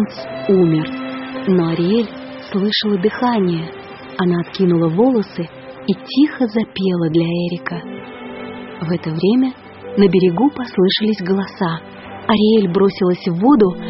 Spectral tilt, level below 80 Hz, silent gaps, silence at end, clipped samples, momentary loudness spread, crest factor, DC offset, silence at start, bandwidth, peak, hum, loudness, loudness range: -5.5 dB/octave; -52 dBFS; none; 0 s; under 0.1%; 15 LU; 16 dB; under 0.1%; 0 s; 6 kHz; 0 dBFS; none; -17 LUFS; 4 LU